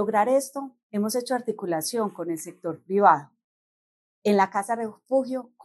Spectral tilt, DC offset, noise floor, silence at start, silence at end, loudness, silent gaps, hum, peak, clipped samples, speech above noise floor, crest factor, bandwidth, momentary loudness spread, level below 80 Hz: -5 dB/octave; under 0.1%; under -90 dBFS; 0 s; 0.2 s; -25 LUFS; 0.83-0.90 s, 3.44-4.22 s; none; -4 dBFS; under 0.1%; over 65 dB; 22 dB; 12.5 kHz; 13 LU; -82 dBFS